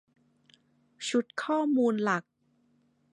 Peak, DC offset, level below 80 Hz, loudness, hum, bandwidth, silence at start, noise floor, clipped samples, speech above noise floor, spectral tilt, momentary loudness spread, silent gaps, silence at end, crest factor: -14 dBFS; under 0.1%; -86 dBFS; -29 LUFS; none; 11 kHz; 1 s; -70 dBFS; under 0.1%; 42 dB; -4.5 dB/octave; 6 LU; none; 0.9 s; 18 dB